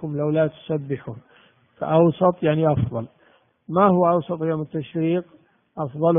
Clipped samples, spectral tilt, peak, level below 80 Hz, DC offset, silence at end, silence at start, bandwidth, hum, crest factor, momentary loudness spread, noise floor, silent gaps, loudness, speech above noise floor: under 0.1%; -8 dB/octave; -4 dBFS; -56 dBFS; under 0.1%; 0 s; 0 s; 3.7 kHz; none; 18 dB; 15 LU; -59 dBFS; none; -22 LUFS; 38 dB